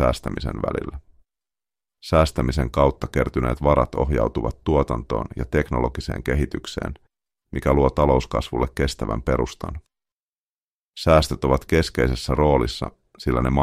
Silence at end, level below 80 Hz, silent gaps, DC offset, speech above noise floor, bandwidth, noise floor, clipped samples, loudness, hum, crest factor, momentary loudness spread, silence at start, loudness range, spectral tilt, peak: 0 s; -30 dBFS; 10.12-10.93 s; under 0.1%; over 69 dB; 15 kHz; under -90 dBFS; under 0.1%; -22 LUFS; none; 20 dB; 12 LU; 0 s; 3 LU; -6.5 dB/octave; -2 dBFS